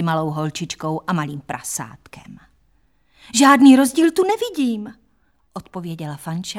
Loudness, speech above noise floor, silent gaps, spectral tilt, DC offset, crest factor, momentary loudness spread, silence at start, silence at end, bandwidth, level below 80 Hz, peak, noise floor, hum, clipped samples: -18 LUFS; 45 dB; none; -4.5 dB/octave; under 0.1%; 18 dB; 21 LU; 0 s; 0 s; 15.5 kHz; -58 dBFS; 0 dBFS; -63 dBFS; none; under 0.1%